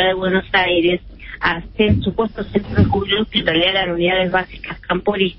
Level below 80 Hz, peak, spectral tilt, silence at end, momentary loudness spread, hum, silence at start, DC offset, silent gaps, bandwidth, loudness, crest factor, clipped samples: -36 dBFS; -2 dBFS; -10.5 dB/octave; 0 s; 8 LU; none; 0 s; under 0.1%; none; 5.8 kHz; -17 LUFS; 16 dB; under 0.1%